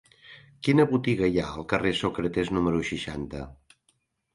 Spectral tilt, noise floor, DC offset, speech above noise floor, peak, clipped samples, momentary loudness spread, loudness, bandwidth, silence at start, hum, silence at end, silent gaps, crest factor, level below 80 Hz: -6.5 dB/octave; -71 dBFS; under 0.1%; 45 dB; -8 dBFS; under 0.1%; 13 LU; -26 LUFS; 11.5 kHz; 0.3 s; none; 0.8 s; none; 18 dB; -48 dBFS